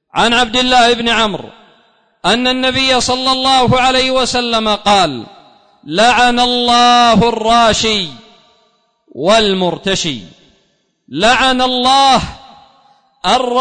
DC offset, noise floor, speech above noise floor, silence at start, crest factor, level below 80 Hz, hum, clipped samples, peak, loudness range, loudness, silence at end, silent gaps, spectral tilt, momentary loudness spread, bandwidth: under 0.1%; -60 dBFS; 48 dB; 0.15 s; 12 dB; -38 dBFS; none; under 0.1%; -2 dBFS; 4 LU; -11 LUFS; 0 s; none; -3 dB/octave; 9 LU; 9.6 kHz